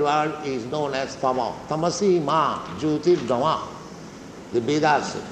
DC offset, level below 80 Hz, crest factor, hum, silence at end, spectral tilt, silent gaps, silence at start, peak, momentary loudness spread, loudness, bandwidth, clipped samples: under 0.1%; -58 dBFS; 16 dB; none; 0 s; -5 dB/octave; none; 0 s; -6 dBFS; 16 LU; -23 LUFS; 9.2 kHz; under 0.1%